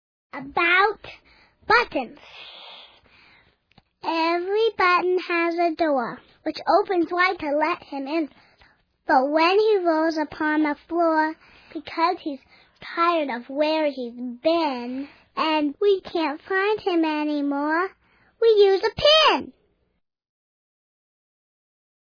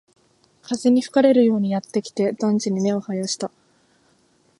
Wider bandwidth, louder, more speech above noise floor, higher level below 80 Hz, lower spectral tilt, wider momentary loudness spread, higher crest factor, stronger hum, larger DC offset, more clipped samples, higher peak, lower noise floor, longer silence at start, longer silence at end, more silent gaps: second, 5.4 kHz vs 11.5 kHz; about the same, -22 LUFS vs -20 LUFS; first, 51 dB vs 41 dB; first, -60 dBFS vs -70 dBFS; second, -4 dB/octave vs -5.5 dB/octave; first, 17 LU vs 11 LU; about the same, 18 dB vs 18 dB; neither; neither; neither; about the same, -6 dBFS vs -4 dBFS; first, -73 dBFS vs -61 dBFS; second, 0.35 s vs 0.7 s; first, 2.7 s vs 1.1 s; neither